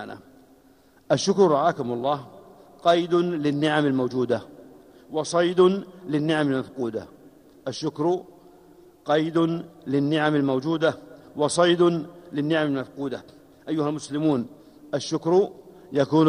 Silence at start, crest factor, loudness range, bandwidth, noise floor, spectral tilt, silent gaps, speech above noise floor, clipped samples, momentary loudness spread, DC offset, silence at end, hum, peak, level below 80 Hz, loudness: 0 s; 18 dB; 5 LU; 11 kHz; -56 dBFS; -5.5 dB/octave; none; 33 dB; under 0.1%; 13 LU; under 0.1%; 0 s; none; -6 dBFS; -66 dBFS; -24 LUFS